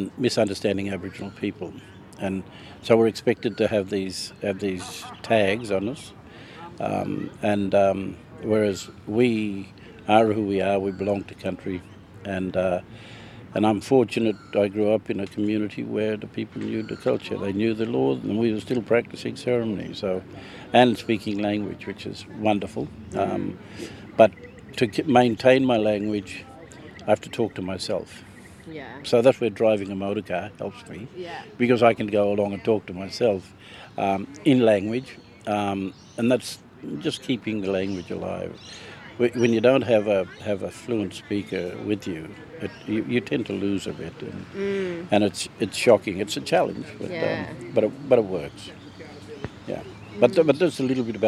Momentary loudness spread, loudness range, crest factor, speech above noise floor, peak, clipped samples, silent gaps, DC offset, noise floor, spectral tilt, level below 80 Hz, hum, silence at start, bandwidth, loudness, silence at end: 18 LU; 5 LU; 24 dB; 19 dB; -2 dBFS; under 0.1%; none; under 0.1%; -43 dBFS; -6 dB/octave; -58 dBFS; none; 0 s; 13.5 kHz; -24 LUFS; 0 s